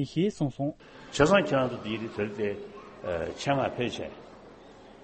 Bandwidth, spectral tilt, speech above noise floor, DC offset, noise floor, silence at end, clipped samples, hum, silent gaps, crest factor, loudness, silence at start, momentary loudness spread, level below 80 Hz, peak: 8.4 kHz; -5.5 dB/octave; 22 dB; under 0.1%; -50 dBFS; 0 s; under 0.1%; none; none; 20 dB; -29 LUFS; 0 s; 18 LU; -54 dBFS; -10 dBFS